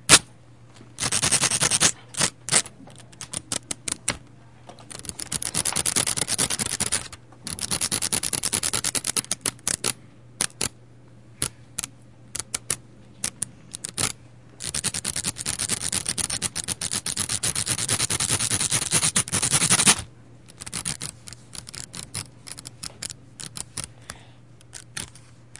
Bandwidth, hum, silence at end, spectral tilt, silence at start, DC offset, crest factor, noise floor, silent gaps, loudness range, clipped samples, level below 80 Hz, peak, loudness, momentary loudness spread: 12 kHz; none; 0.25 s; -1 dB/octave; 0.1 s; 0.2%; 28 dB; -50 dBFS; none; 13 LU; under 0.1%; -52 dBFS; 0 dBFS; -23 LUFS; 18 LU